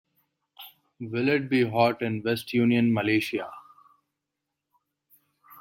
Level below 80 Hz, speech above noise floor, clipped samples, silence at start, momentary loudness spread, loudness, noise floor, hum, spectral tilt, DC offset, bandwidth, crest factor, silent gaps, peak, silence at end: -70 dBFS; 60 dB; under 0.1%; 0.6 s; 24 LU; -25 LUFS; -84 dBFS; none; -6.5 dB/octave; under 0.1%; 16.5 kHz; 20 dB; none; -8 dBFS; 0 s